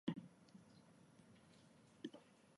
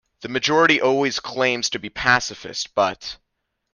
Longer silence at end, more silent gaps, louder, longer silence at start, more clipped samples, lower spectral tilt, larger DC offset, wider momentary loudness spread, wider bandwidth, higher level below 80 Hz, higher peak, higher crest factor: second, 0 s vs 0.6 s; neither; second, -59 LUFS vs -20 LUFS; second, 0.05 s vs 0.2 s; neither; first, -6.5 dB/octave vs -3 dB/octave; neither; about the same, 13 LU vs 12 LU; about the same, 11.5 kHz vs 10.5 kHz; second, -88 dBFS vs -54 dBFS; second, -28 dBFS vs -4 dBFS; first, 26 dB vs 18 dB